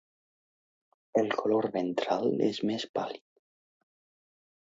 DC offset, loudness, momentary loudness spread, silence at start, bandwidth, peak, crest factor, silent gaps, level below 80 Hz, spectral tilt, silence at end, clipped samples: under 0.1%; -30 LUFS; 8 LU; 1.15 s; 7.8 kHz; -12 dBFS; 20 dB; 2.89-2.94 s; -78 dBFS; -6 dB/octave; 1.55 s; under 0.1%